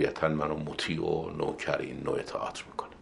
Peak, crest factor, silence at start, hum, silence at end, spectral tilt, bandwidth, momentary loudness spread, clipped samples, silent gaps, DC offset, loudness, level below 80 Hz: -10 dBFS; 22 dB; 0 s; none; 0 s; -5.5 dB/octave; 11.5 kHz; 7 LU; under 0.1%; none; under 0.1%; -32 LUFS; -54 dBFS